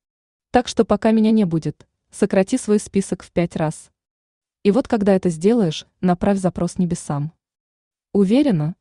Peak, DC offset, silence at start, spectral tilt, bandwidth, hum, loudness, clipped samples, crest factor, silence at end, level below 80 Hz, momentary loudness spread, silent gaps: -4 dBFS; under 0.1%; 0.55 s; -6.5 dB/octave; 11 kHz; none; -19 LUFS; under 0.1%; 16 dB; 0.05 s; -48 dBFS; 9 LU; 4.11-4.41 s, 7.60-7.91 s